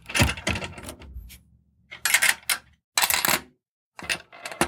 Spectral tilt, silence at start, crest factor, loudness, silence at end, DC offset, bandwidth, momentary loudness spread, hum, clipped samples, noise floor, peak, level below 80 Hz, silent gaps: -2 dB/octave; 0.05 s; 24 dB; -23 LUFS; 0 s; under 0.1%; 19 kHz; 22 LU; none; under 0.1%; -60 dBFS; -2 dBFS; -44 dBFS; 2.84-2.92 s, 3.68-3.92 s